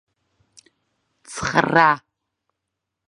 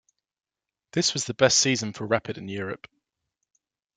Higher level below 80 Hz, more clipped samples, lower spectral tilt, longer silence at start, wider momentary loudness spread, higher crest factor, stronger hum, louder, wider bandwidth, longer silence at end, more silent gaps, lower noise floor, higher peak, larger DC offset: first, -54 dBFS vs -64 dBFS; neither; first, -4.5 dB/octave vs -3 dB/octave; first, 1.3 s vs 0.95 s; about the same, 13 LU vs 15 LU; about the same, 24 dB vs 24 dB; neither; first, -18 LUFS vs -24 LUFS; about the same, 11 kHz vs 11 kHz; about the same, 1.1 s vs 1.2 s; neither; about the same, -81 dBFS vs -82 dBFS; first, 0 dBFS vs -4 dBFS; neither